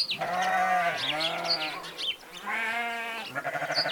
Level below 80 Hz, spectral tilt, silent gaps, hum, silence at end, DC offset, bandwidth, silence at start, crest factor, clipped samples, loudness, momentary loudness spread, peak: -70 dBFS; -2 dB/octave; none; none; 0 s; under 0.1%; 19 kHz; 0 s; 16 dB; under 0.1%; -29 LUFS; 8 LU; -12 dBFS